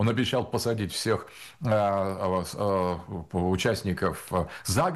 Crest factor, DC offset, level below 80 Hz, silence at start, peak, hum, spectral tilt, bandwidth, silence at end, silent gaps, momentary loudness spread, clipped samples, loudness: 14 dB; under 0.1%; -50 dBFS; 0 s; -12 dBFS; none; -5.5 dB/octave; 13 kHz; 0 s; none; 6 LU; under 0.1%; -28 LUFS